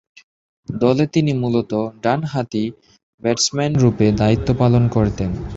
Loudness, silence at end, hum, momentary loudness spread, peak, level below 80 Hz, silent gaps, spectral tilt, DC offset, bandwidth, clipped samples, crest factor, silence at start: -18 LUFS; 0 s; none; 9 LU; -2 dBFS; -38 dBFS; 3.03-3.18 s; -6 dB/octave; under 0.1%; 8 kHz; under 0.1%; 16 dB; 0.7 s